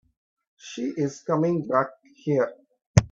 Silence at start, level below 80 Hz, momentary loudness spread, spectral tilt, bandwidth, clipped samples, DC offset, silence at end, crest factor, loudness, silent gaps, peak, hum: 0.65 s; -48 dBFS; 11 LU; -6.5 dB/octave; 8.6 kHz; under 0.1%; under 0.1%; 0.05 s; 24 dB; -26 LUFS; 2.86-2.94 s; -2 dBFS; none